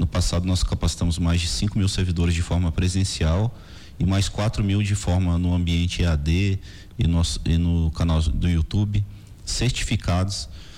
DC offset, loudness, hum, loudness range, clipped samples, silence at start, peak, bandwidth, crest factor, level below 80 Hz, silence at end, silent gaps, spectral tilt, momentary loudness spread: under 0.1%; -23 LUFS; none; 1 LU; under 0.1%; 0 s; -12 dBFS; 12.5 kHz; 10 dB; -30 dBFS; 0 s; none; -5.5 dB/octave; 5 LU